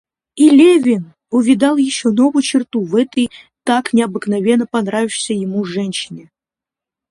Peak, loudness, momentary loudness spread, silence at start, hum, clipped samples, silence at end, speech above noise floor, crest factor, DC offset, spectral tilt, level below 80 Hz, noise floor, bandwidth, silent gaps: 0 dBFS; -15 LUFS; 10 LU; 0.35 s; none; under 0.1%; 0.9 s; 74 dB; 14 dB; under 0.1%; -5 dB/octave; -60 dBFS; -87 dBFS; 11.5 kHz; none